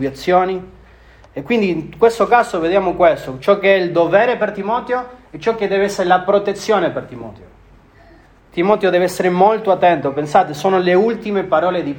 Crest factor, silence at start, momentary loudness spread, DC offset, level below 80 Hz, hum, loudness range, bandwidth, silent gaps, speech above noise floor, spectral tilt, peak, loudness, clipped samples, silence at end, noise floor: 16 dB; 0 s; 9 LU; under 0.1%; -48 dBFS; none; 4 LU; 17.5 kHz; none; 31 dB; -5.5 dB/octave; 0 dBFS; -16 LUFS; under 0.1%; 0 s; -46 dBFS